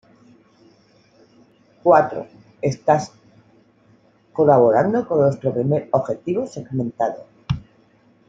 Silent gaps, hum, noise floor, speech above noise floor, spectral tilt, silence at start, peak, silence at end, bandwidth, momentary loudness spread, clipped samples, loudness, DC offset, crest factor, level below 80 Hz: none; none; -56 dBFS; 37 dB; -8 dB/octave; 1.85 s; -2 dBFS; 0.65 s; 7.8 kHz; 14 LU; under 0.1%; -19 LUFS; under 0.1%; 20 dB; -52 dBFS